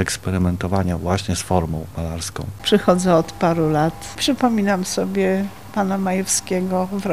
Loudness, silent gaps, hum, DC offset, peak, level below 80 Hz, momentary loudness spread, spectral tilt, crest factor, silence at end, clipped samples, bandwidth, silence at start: -20 LUFS; none; none; 0.7%; -2 dBFS; -40 dBFS; 9 LU; -5 dB/octave; 18 dB; 0 s; under 0.1%; 15.5 kHz; 0 s